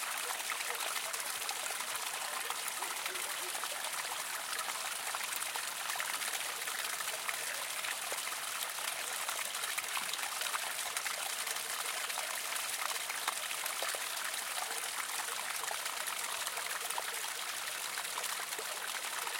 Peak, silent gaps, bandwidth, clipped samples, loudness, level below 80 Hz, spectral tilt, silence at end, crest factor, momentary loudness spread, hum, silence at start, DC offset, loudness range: -16 dBFS; none; 17 kHz; under 0.1%; -36 LUFS; -86 dBFS; 2 dB/octave; 0 s; 22 dB; 2 LU; none; 0 s; under 0.1%; 1 LU